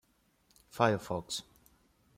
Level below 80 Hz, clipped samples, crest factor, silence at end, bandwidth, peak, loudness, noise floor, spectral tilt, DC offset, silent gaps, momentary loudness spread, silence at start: -68 dBFS; under 0.1%; 26 dB; 0.75 s; 16.5 kHz; -12 dBFS; -33 LUFS; -71 dBFS; -4.5 dB/octave; under 0.1%; none; 11 LU; 0.75 s